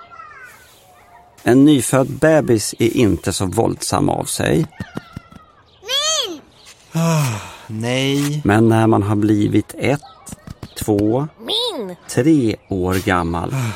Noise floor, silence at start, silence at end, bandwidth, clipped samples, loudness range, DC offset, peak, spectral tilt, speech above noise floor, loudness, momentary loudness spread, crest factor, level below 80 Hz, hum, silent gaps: -47 dBFS; 0 s; 0 s; 16.5 kHz; under 0.1%; 5 LU; under 0.1%; -2 dBFS; -5 dB/octave; 31 dB; -17 LUFS; 18 LU; 16 dB; -44 dBFS; none; none